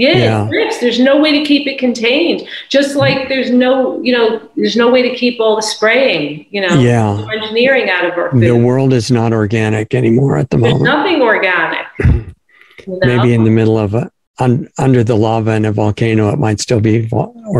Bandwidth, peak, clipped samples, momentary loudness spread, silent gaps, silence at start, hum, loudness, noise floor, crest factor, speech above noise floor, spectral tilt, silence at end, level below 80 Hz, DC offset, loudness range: 12 kHz; 0 dBFS; under 0.1%; 6 LU; 14.27-14.34 s; 0 s; none; -12 LUFS; -42 dBFS; 12 dB; 30 dB; -6 dB/octave; 0 s; -34 dBFS; under 0.1%; 2 LU